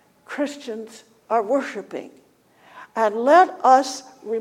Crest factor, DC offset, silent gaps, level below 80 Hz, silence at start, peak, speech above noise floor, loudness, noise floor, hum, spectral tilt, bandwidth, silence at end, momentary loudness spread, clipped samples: 20 dB; under 0.1%; none; -80 dBFS; 0.3 s; -2 dBFS; 35 dB; -20 LUFS; -55 dBFS; none; -3 dB/octave; 14 kHz; 0 s; 20 LU; under 0.1%